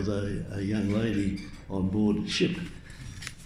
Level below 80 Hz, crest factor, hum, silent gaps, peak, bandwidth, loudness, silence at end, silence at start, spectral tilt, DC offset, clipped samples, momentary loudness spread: -46 dBFS; 16 dB; none; none; -14 dBFS; 12 kHz; -29 LUFS; 0 s; 0 s; -6 dB/octave; under 0.1%; under 0.1%; 14 LU